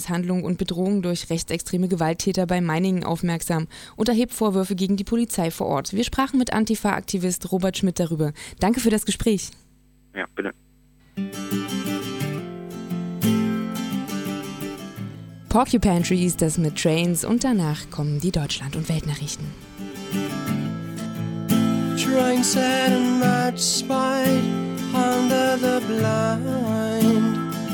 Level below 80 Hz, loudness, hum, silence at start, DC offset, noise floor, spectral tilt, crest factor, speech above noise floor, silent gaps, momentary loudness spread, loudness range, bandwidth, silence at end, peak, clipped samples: -44 dBFS; -23 LUFS; none; 0 s; under 0.1%; -56 dBFS; -5 dB/octave; 20 dB; 34 dB; none; 12 LU; 7 LU; 18 kHz; 0 s; -4 dBFS; under 0.1%